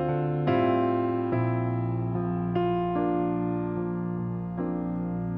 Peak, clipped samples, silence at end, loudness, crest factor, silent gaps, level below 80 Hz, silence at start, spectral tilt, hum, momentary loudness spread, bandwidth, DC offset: -12 dBFS; under 0.1%; 0 s; -28 LUFS; 14 dB; none; -52 dBFS; 0 s; -11.5 dB/octave; none; 6 LU; 5 kHz; under 0.1%